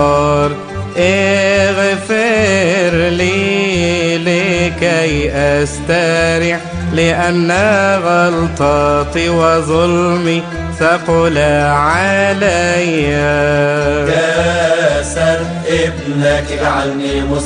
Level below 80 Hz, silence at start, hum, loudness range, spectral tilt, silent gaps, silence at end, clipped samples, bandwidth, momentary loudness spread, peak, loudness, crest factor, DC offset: -30 dBFS; 0 s; none; 1 LU; -5 dB/octave; none; 0 s; under 0.1%; 10 kHz; 4 LU; 0 dBFS; -13 LUFS; 12 dB; under 0.1%